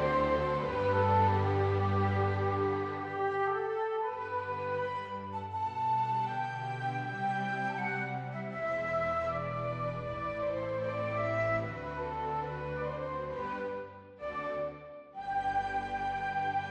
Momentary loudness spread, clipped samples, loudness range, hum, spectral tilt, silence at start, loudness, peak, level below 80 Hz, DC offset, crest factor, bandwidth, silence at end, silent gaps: 9 LU; under 0.1%; 7 LU; none; -7.5 dB/octave; 0 s; -33 LUFS; -18 dBFS; -56 dBFS; under 0.1%; 16 dB; 8.4 kHz; 0 s; none